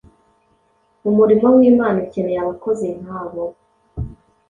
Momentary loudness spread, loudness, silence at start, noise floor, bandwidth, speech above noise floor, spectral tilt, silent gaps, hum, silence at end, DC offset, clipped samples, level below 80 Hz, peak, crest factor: 19 LU; -17 LUFS; 1.05 s; -61 dBFS; 7.4 kHz; 45 dB; -9 dB/octave; none; none; 0.35 s; under 0.1%; under 0.1%; -44 dBFS; -2 dBFS; 16 dB